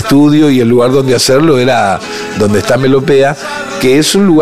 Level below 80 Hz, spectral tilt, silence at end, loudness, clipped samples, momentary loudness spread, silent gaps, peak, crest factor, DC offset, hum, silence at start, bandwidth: -40 dBFS; -5 dB/octave; 0 s; -9 LUFS; under 0.1%; 6 LU; none; 0 dBFS; 8 dB; 3%; none; 0 s; 15.5 kHz